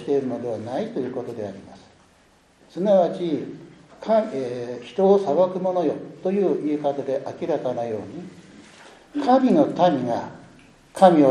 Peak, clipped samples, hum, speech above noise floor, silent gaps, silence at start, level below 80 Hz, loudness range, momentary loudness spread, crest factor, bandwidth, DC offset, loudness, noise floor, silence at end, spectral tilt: -2 dBFS; under 0.1%; none; 36 dB; none; 0 s; -66 dBFS; 4 LU; 18 LU; 20 dB; 10.5 kHz; under 0.1%; -22 LUFS; -57 dBFS; 0 s; -7.5 dB/octave